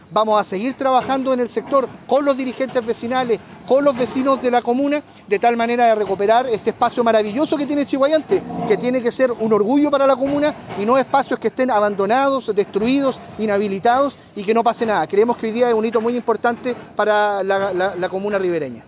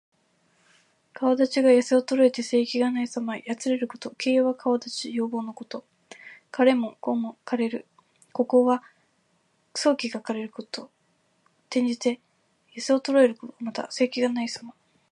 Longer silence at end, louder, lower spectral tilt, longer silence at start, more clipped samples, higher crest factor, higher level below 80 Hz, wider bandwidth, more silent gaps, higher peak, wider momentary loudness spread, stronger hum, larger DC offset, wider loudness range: second, 0.05 s vs 0.4 s; first, -18 LUFS vs -25 LUFS; first, -10 dB/octave vs -4 dB/octave; second, 0.1 s vs 1.2 s; neither; second, 14 dB vs 20 dB; first, -56 dBFS vs -82 dBFS; second, 4 kHz vs 11 kHz; neither; about the same, -4 dBFS vs -6 dBFS; second, 6 LU vs 16 LU; neither; neither; second, 2 LU vs 6 LU